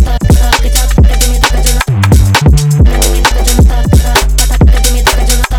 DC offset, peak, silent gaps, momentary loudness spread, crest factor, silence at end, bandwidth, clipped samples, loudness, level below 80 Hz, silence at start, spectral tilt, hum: under 0.1%; 0 dBFS; none; 3 LU; 6 dB; 0 s; over 20 kHz; under 0.1%; -9 LUFS; -8 dBFS; 0 s; -4.5 dB/octave; none